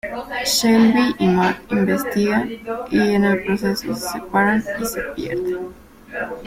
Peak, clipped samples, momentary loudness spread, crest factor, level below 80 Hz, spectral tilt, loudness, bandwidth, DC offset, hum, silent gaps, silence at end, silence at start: -4 dBFS; under 0.1%; 12 LU; 16 dB; -48 dBFS; -4.5 dB/octave; -19 LUFS; 16.5 kHz; under 0.1%; none; none; 0 s; 0.05 s